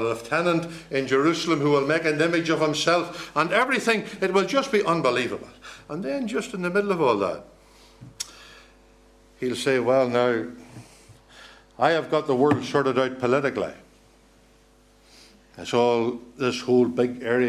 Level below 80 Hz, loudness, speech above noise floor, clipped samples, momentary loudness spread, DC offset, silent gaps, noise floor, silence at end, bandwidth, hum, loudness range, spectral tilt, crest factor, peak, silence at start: -60 dBFS; -23 LUFS; 33 dB; under 0.1%; 12 LU; under 0.1%; none; -56 dBFS; 0 s; 14 kHz; none; 6 LU; -5 dB/octave; 20 dB; -4 dBFS; 0 s